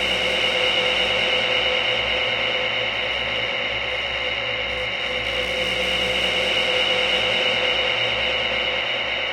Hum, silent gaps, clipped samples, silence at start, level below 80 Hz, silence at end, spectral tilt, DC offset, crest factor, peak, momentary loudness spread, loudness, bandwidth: none; none; under 0.1%; 0 s; -44 dBFS; 0 s; -2.5 dB/octave; under 0.1%; 14 dB; -8 dBFS; 5 LU; -20 LUFS; 16.5 kHz